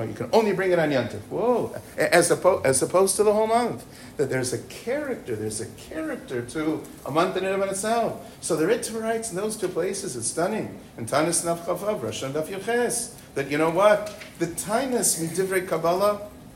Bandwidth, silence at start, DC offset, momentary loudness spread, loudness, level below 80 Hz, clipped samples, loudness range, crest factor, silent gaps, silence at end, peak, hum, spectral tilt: 16 kHz; 0 s; under 0.1%; 12 LU; -24 LUFS; -56 dBFS; under 0.1%; 6 LU; 20 dB; none; 0 s; -4 dBFS; none; -4 dB/octave